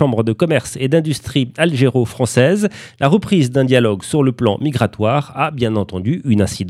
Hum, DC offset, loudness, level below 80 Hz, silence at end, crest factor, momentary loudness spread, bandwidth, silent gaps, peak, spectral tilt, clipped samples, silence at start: none; under 0.1%; -16 LUFS; -48 dBFS; 0 s; 16 dB; 5 LU; 14 kHz; none; 0 dBFS; -6 dB/octave; under 0.1%; 0 s